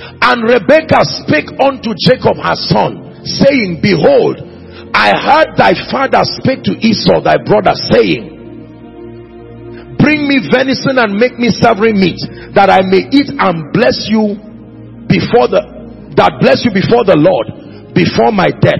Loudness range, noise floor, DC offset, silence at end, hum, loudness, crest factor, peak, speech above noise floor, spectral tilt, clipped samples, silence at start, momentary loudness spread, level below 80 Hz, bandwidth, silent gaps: 3 LU; -31 dBFS; 0.2%; 0 s; none; -10 LUFS; 10 dB; 0 dBFS; 21 dB; -6.5 dB/octave; 0.4%; 0 s; 16 LU; -40 dBFS; 9.6 kHz; none